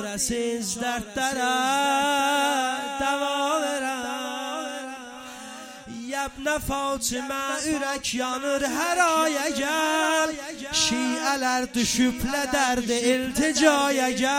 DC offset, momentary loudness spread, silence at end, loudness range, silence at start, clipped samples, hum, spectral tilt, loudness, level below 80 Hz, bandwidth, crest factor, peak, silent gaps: under 0.1%; 10 LU; 0 s; 7 LU; 0 s; under 0.1%; none; -2 dB/octave; -24 LUFS; -50 dBFS; 16.5 kHz; 20 dB; -4 dBFS; none